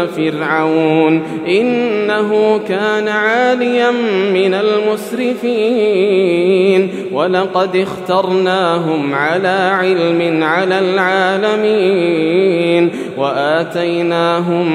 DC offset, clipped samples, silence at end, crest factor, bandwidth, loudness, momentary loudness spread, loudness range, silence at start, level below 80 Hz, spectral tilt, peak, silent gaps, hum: under 0.1%; under 0.1%; 0 s; 12 dB; 14 kHz; -14 LUFS; 4 LU; 1 LU; 0 s; -66 dBFS; -6 dB/octave; 0 dBFS; none; none